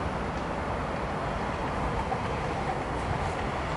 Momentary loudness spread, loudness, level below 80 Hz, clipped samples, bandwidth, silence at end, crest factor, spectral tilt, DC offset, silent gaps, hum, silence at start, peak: 1 LU; -31 LUFS; -40 dBFS; under 0.1%; 11.5 kHz; 0 s; 14 dB; -6 dB/octave; under 0.1%; none; none; 0 s; -16 dBFS